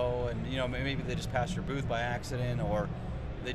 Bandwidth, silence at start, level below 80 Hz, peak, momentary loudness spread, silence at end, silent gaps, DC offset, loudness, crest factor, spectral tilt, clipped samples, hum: 13.5 kHz; 0 s; -42 dBFS; -18 dBFS; 5 LU; 0 s; none; under 0.1%; -34 LUFS; 16 dB; -6 dB/octave; under 0.1%; none